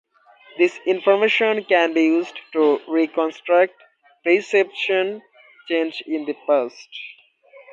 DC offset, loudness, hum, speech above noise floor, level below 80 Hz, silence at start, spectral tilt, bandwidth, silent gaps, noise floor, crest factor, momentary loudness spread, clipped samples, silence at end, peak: under 0.1%; -20 LUFS; none; 31 dB; -78 dBFS; 0.55 s; -4.5 dB/octave; 7.6 kHz; none; -51 dBFS; 18 dB; 12 LU; under 0.1%; 0.6 s; -4 dBFS